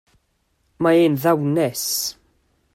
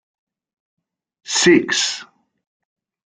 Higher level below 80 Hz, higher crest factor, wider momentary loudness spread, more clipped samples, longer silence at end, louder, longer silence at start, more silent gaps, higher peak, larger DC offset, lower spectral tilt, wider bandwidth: about the same, -62 dBFS vs -64 dBFS; about the same, 16 dB vs 20 dB; second, 7 LU vs 10 LU; neither; second, 0.65 s vs 1.1 s; second, -19 LUFS vs -16 LUFS; second, 0.8 s vs 1.25 s; neither; second, -6 dBFS vs -2 dBFS; neither; first, -4.5 dB/octave vs -2.5 dB/octave; first, 16.5 kHz vs 9.6 kHz